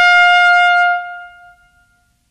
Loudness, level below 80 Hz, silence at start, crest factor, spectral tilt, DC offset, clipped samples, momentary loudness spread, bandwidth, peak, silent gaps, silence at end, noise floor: -10 LUFS; -60 dBFS; 0 s; 12 dB; 2.5 dB/octave; under 0.1%; under 0.1%; 21 LU; 11.5 kHz; -2 dBFS; none; 1.05 s; -57 dBFS